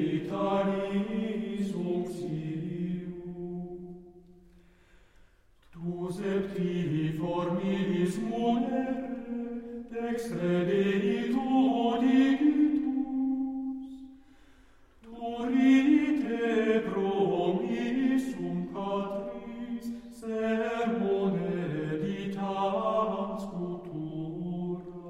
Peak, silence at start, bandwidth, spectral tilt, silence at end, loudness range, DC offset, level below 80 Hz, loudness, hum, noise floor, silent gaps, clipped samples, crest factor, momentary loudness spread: -14 dBFS; 0 s; 11.5 kHz; -7.5 dB/octave; 0 s; 10 LU; under 0.1%; -60 dBFS; -30 LUFS; none; -60 dBFS; none; under 0.1%; 16 dB; 13 LU